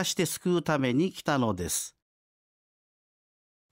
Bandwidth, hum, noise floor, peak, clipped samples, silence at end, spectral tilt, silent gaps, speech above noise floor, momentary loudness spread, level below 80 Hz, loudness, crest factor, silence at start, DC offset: 16 kHz; none; under -90 dBFS; -14 dBFS; under 0.1%; 1.8 s; -4.5 dB/octave; none; over 62 dB; 5 LU; -60 dBFS; -28 LUFS; 16 dB; 0 s; under 0.1%